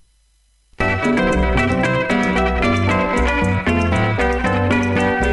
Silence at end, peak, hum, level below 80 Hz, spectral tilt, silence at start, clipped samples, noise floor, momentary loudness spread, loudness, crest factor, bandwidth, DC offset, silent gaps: 0 s; -4 dBFS; none; -28 dBFS; -6.5 dB/octave; 0.8 s; under 0.1%; -58 dBFS; 1 LU; -17 LUFS; 14 dB; 11.5 kHz; under 0.1%; none